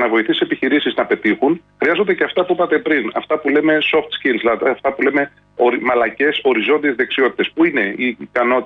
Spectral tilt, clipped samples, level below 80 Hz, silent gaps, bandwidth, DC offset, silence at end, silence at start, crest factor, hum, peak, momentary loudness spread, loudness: -7 dB/octave; under 0.1%; -58 dBFS; none; 5 kHz; under 0.1%; 0 s; 0 s; 12 dB; none; -4 dBFS; 4 LU; -16 LUFS